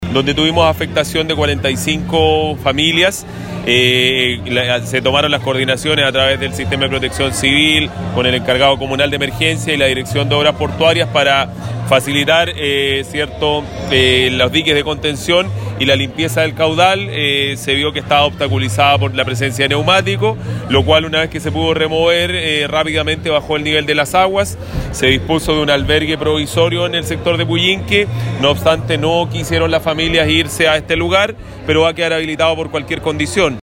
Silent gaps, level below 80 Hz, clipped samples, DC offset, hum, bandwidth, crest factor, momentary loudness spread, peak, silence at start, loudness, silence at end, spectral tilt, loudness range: none; -36 dBFS; under 0.1%; under 0.1%; none; 16.5 kHz; 14 dB; 5 LU; 0 dBFS; 0 s; -14 LUFS; 0 s; -4.5 dB/octave; 1 LU